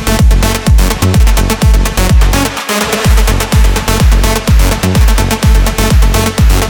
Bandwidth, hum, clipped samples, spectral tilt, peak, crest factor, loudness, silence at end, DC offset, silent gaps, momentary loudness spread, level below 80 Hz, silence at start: 19.5 kHz; none; under 0.1%; -4.5 dB/octave; 0 dBFS; 8 dB; -10 LUFS; 0 s; under 0.1%; none; 2 LU; -10 dBFS; 0 s